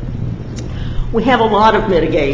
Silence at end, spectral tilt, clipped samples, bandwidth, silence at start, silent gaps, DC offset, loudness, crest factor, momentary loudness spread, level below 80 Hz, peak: 0 s; -7 dB/octave; under 0.1%; 7.6 kHz; 0 s; none; under 0.1%; -14 LUFS; 14 dB; 14 LU; -26 dBFS; 0 dBFS